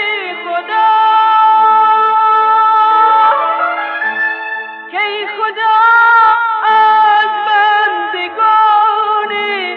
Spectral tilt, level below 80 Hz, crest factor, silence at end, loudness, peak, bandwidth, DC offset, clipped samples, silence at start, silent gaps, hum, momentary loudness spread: -2.5 dB/octave; -70 dBFS; 10 dB; 0 s; -10 LUFS; -2 dBFS; 5.6 kHz; under 0.1%; under 0.1%; 0 s; none; none; 9 LU